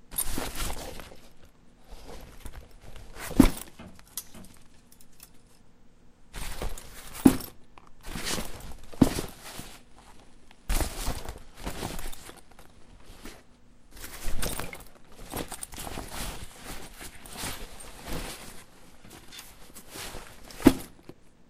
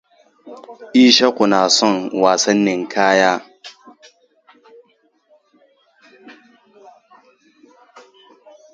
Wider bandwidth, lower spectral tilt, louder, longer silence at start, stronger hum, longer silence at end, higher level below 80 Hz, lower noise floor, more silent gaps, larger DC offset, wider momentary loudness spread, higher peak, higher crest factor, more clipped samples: first, 16 kHz vs 9.2 kHz; first, -4.5 dB/octave vs -3 dB/octave; second, -31 LUFS vs -14 LUFS; second, 0.05 s vs 0.45 s; neither; second, 0.1 s vs 2.45 s; first, -40 dBFS vs -66 dBFS; second, -53 dBFS vs -60 dBFS; neither; neither; about the same, 27 LU vs 27 LU; about the same, 0 dBFS vs 0 dBFS; first, 32 dB vs 20 dB; neither